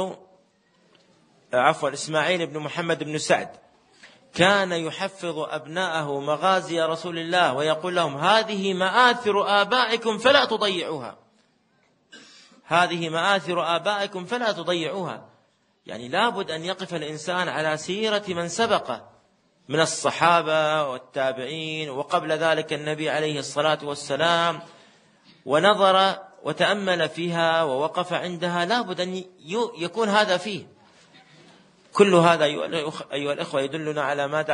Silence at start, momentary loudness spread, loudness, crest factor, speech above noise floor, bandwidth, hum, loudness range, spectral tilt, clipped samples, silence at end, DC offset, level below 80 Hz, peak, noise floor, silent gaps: 0 s; 11 LU; -23 LUFS; 22 dB; 41 dB; 10 kHz; none; 5 LU; -4 dB/octave; under 0.1%; 0 s; under 0.1%; -72 dBFS; -2 dBFS; -65 dBFS; none